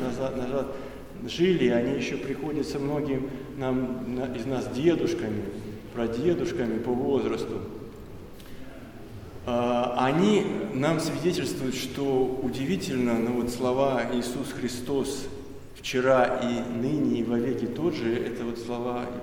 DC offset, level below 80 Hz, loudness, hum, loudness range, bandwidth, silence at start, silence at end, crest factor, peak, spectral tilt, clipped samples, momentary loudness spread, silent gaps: under 0.1%; -50 dBFS; -27 LUFS; none; 4 LU; 17.5 kHz; 0 s; 0 s; 18 dB; -10 dBFS; -6 dB/octave; under 0.1%; 16 LU; none